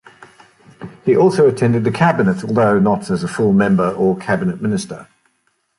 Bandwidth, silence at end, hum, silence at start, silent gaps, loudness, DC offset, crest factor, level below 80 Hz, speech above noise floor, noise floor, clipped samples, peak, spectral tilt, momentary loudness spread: 11.5 kHz; 0.75 s; none; 0.8 s; none; -16 LUFS; under 0.1%; 14 dB; -50 dBFS; 50 dB; -65 dBFS; under 0.1%; -2 dBFS; -7.5 dB/octave; 10 LU